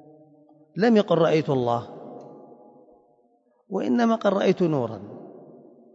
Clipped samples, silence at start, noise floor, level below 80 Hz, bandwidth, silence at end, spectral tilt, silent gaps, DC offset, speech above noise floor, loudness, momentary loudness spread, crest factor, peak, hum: under 0.1%; 0.75 s; -64 dBFS; -72 dBFS; 7.6 kHz; 0.5 s; -7.5 dB/octave; none; under 0.1%; 42 dB; -23 LUFS; 22 LU; 18 dB; -8 dBFS; none